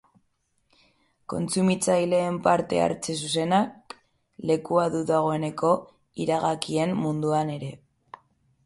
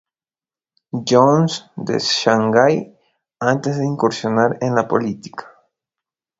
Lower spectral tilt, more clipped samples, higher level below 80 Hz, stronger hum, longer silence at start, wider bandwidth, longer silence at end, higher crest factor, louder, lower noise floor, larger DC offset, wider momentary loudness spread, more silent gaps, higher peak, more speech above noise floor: about the same, -5.5 dB/octave vs -5.5 dB/octave; neither; about the same, -62 dBFS vs -60 dBFS; neither; first, 1.3 s vs 0.95 s; first, 11.5 kHz vs 8 kHz; about the same, 0.9 s vs 0.95 s; about the same, 20 dB vs 18 dB; second, -25 LUFS vs -17 LUFS; second, -71 dBFS vs under -90 dBFS; neither; about the same, 13 LU vs 14 LU; neither; second, -6 dBFS vs 0 dBFS; second, 47 dB vs over 73 dB